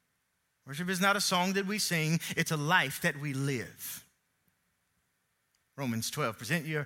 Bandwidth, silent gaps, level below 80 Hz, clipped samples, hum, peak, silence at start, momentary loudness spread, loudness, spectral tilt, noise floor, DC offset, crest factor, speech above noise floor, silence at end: 17 kHz; none; -74 dBFS; under 0.1%; none; -12 dBFS; 0.65 s; 13 LU; -31 LUFS; -4 dB/octave; -78 dBFS; under 0.1%; 22 dB; 47 dB; 0 s